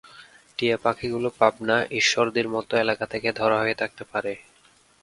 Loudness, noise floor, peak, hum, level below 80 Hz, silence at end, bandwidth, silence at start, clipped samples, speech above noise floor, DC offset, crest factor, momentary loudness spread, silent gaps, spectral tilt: -24 LUFS; -58 dBFS; -2 dBFS; none; -60 dBFS; 0.65 s; 11.5 kHz; 0.15 s; under 0.1%; 34 dB; under 0.1%; 22 dB; 9 LU; none; -3.5 dB/octave